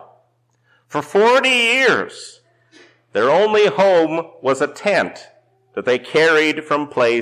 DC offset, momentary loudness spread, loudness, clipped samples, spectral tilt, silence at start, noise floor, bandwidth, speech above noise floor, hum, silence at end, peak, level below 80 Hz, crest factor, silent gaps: under 0.1%; 13 LU; -16 LUFS; under 0.1%; -3.5 dB/octave; 0.9 s; -62 dBFS; 14 kHz; 46 dB; none; 0 s; -8 dBFS; -68 dBFS; 10 dB; none